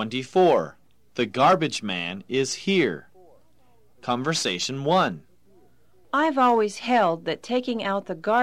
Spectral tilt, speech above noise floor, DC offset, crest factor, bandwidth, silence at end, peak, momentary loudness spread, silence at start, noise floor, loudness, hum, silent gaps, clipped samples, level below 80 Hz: -4.5 dB/octave; 40 dB; 0.2%; 16 dB; 15.5 kHz; 0 s; -8 dBFS; 10 LU; 0 s; -63 dBFS; -23 LUFS; none; none; under 0.1%; -66 dBFS